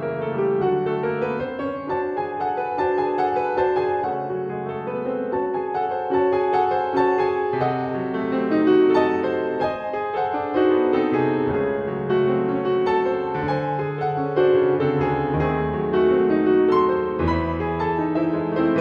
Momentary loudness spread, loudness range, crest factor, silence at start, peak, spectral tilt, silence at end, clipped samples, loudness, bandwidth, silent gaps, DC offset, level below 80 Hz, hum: 7 LU; 3 LU; 14 dB; 0 s; -6 dBFS; -9 dB/octave; 0 s; under 0.1%; -22 LUFS; 5.6 kHz; none; under 0.1%; -50 dBFS; none